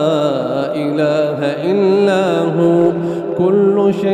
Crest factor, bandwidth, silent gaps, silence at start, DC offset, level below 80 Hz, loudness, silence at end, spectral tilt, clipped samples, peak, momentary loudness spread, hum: 10 dB; 9.6 kHz; none; 0 s; under 0.1%; -58 dBFS; -15 LUFS; 0 s; -7.5 dB/octave; under 0.1%; -2 dBFS; 6 LU; none